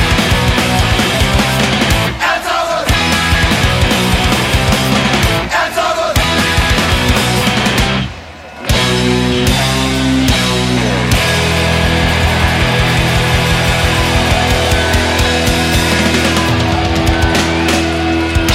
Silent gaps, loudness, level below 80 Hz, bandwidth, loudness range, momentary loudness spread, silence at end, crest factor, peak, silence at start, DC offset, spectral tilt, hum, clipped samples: none; -12 LUFS; -20 dBFS; 16.5 kHz; 1 LU; 2 LU; 0 s; 12 dB; 0 dBFS; 0 s; under 0.1%; -4 dB/octave; none; under 0.1%